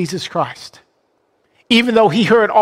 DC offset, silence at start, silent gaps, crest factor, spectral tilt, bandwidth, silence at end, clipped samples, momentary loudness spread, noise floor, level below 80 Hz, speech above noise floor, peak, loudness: under 0.1%; 0 s; none; 14 dB; -5 dB/octave; 15 kHz; 0 s; under 0.1%; 12 LU; -62 dBFS; -56 dBFS; 48 dB; -2 dBFS; -14 LUFS